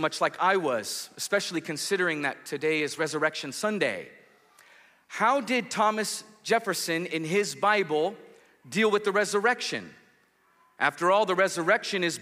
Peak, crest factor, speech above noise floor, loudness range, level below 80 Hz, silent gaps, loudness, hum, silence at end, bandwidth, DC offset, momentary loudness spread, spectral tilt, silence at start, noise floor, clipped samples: -10 dBFS; 18 dB; 38 dB; 3 LU; -82 dBFS; none; -27 LUFS; none; 0 s; 15.5 kHz; under 0.1%; 8 LU; -3 dB/octave; 0 s; -65 dBFS; under 0.1%